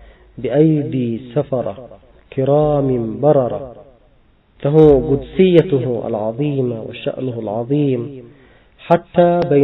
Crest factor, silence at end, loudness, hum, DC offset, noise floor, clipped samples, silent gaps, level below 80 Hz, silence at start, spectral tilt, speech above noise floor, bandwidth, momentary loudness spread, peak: 16 dB; 0 s; -16 LUFS; none; under 0.1%; -52 dBFS; under 0.1%; none; -42 dBFS; 0.35 s; -8 dB/octave; 37 dB; 5.6 kHz; 13 LU; 0 dBFS